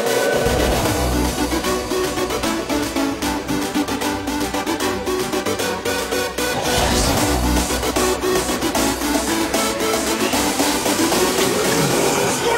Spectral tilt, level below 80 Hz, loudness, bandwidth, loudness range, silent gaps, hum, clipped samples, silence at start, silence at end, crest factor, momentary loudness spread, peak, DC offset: -3.5 dB/octave; -32 dBFS; -19 LUFS; 16.5 kHz; 4 LU; none; none; under 0.1%; 0 s; 0 s; 16 dB; 5 LU; -2 dBFS; under 0.1%